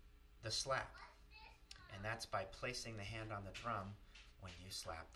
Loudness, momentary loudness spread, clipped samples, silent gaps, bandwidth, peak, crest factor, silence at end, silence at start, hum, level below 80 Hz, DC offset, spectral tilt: -46 LUFS; 17 LU; under 0.1%; none; 14 kHz; -26 dBFS; 22 dB; 0 s; 0 s; none; -64 dBFS; under 0.1%; -3 dB/octave